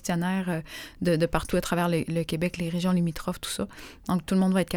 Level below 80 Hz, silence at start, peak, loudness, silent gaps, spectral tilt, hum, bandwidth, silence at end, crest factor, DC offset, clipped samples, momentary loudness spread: -46 dBFS; 0.05 s; -10 dBFS; -27 LUFS; none; -6 dB/octave; none; 18.5 kHz; 0 s; 18 dB; under 0.1%; under 0.1%; 9 LU